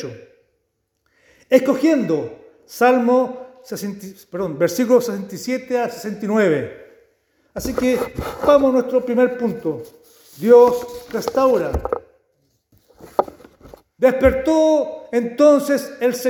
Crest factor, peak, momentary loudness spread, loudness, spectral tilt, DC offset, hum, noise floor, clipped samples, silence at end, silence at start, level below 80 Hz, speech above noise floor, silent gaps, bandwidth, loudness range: 18 dB; 0 dBFS; 15 LU; -18 LUFS; -5.5 dB/octave; under 0.1%; none; -71 dBFS; under 0.1%; 0 s; 0 s; -44 dBFS; 54 dB; none; 20 kHz; 5 LU